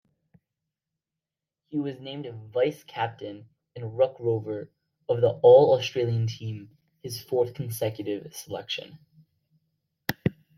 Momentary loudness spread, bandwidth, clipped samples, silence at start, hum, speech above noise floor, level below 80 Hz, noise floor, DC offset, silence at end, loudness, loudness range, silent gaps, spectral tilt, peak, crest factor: 20 LU; 16.5 kHz; under 0.1%; 1.7 s; none; 63 dB; -66 dBFS; -89 dBFS; under 0.1%; 0.25 s; -26 LUFS; 10 LU; none; -6 dB/octave; -6 dBFS; 22 dB